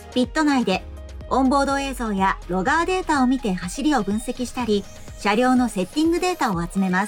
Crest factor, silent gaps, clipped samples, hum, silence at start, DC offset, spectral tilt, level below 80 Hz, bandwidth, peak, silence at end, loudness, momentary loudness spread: 14 dB; none; under 0.1%; none; 0 s; under 0.1%; -5 dB/octave; -38 dBFS; 17.5 kHz; -8 dBFS; 0 s; -22 LUFS; 7 LU